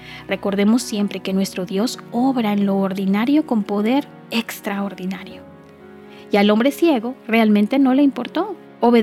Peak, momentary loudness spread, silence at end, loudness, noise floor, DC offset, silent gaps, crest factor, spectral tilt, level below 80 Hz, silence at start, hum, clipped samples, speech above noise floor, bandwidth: -2 dBFS; 10 LU; 0 s; -19 LUFS; -42 dBFS; under 0.1%; none; 16 dB; -6 dB/octave; -62 dBFS; 0 s; none; under 0.1%; 23 dB; 15.5 kHz